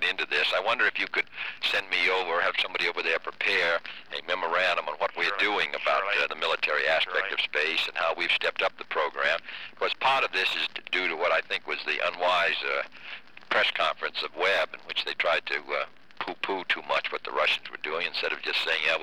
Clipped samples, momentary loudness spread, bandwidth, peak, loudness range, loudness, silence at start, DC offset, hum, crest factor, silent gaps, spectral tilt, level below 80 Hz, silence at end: under 0.1%; 7 LU; 19.5 kHz; -12 dBFS; 3 LU; -26 LUFS; 0 s; 0.4%; none; 16 dB; none; -1.5 dB/octave; -74 dBFS; 0 s